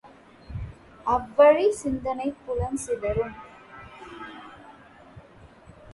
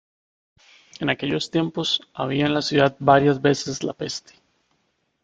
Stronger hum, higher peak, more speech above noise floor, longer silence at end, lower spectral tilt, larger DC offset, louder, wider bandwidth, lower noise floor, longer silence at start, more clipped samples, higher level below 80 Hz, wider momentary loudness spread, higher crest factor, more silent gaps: neither; second, -6 dBFS vs -2 dBFS; second, 27 dB vs 49 dB; second, 0 s vs 1.05 s; about the same, -6 dB/octave vs -5 dB/octave; neither; about the same, -24 LUFS vs -22 LUFS; first, 11.5 kHz vs 9.2 kHz; second, -50 dBFS vs -70 dBFS; second, 0.05 s vs 1 s; neither; first, -46 dBFS vs -58 dBFS; first, 26 LU vs 12 LU; about the same, 22 dB vs 22 dB; neither